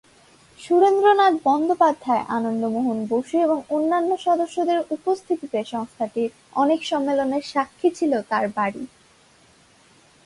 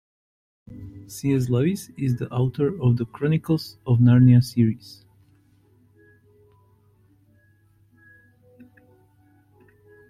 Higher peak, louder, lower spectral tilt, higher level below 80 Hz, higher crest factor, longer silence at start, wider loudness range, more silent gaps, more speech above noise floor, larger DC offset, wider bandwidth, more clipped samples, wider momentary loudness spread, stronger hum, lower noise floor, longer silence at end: about the same, -4 dBFS vs -6 dBFS; about the same, -22 LUFS vs -21 LUFS; second, -5 dB/octave vs -8 dB/octave; second, -68 dBFS vs -54 dBFS; about the same, 18 dB vs 18 dB; about the same, 0.6 s vs 0.7 s; about the same, 4 LU vs 5 LU; neither; second, 34 dB vs 39 dB; neither; second, 11.5 kHz vs 14 kHz; neither; second, 9 LU vs 19 LU; neither; second, -55 dBFS vs -59 dBFS; second, 1.4 s vs 5.3 s